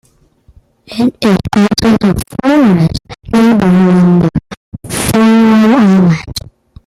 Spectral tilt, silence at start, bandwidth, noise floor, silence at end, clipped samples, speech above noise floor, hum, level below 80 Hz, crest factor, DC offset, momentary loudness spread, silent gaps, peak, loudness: -6.5 dB/octave; 0.9 s; 14.5 kHz; -48 dBFS; 0.45 s; under 0.1%; 38 dB; none; -34 dBFS; 10 dB; under 0.1%; 15 LU; 4.57-4.72 s; 0 dBFS; -9 LUFS